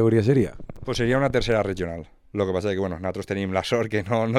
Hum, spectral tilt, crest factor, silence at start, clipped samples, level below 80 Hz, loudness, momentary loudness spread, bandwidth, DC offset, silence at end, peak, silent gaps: none; -6.5 dB/octave; 18 dB; 0 s; under 0.1%; -44 dBFS; -24 LUFS; 10 LU; 13.5 kHz; under 0.1%; 0 s; -6 dBFS; none